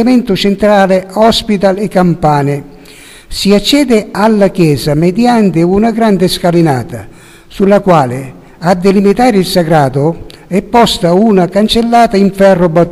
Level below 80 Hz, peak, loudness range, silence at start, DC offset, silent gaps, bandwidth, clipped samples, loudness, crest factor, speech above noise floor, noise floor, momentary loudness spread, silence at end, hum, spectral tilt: -34 dBFS; 0 dBFS; 2 LU; 0 s; under 0.1%; none; 15 kHz; 1%; -9 LUFS; 8 dB; 26 dB; -34 dBFS; 8 LU; 0 s; none; -6 dB/octave